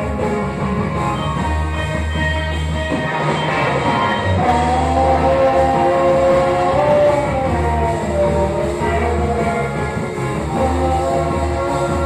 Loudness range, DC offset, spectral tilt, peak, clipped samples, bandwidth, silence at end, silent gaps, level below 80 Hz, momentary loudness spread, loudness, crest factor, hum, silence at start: 4 LU; under 0.1%; -6.5 dB/octave; -4 dBFS; under 0.1%; 13 kHz; 0 s; none; -28 dBFS; 6 LU; -17 LUFS; 12 dB; none; 0 s